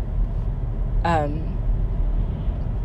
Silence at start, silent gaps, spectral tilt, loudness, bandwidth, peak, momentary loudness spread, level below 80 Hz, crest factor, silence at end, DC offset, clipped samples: 0 s; none; -8.5 dB/octave; -26 LUFS; 8 kHz; -8 dBFS; 6 LU; -24 dBFS; 14 dB; 0 s; under 0.1%; under 0.1%